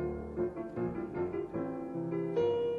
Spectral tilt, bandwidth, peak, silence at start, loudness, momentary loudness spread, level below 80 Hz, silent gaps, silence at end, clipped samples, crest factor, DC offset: -9 dB/octave; 6.6 kHz; -20 dBFS; 0 s; -36 LUFS; 6 LU; -56 dBFS; none; 0 s; under 0.1%; 14 dB; under 0.1%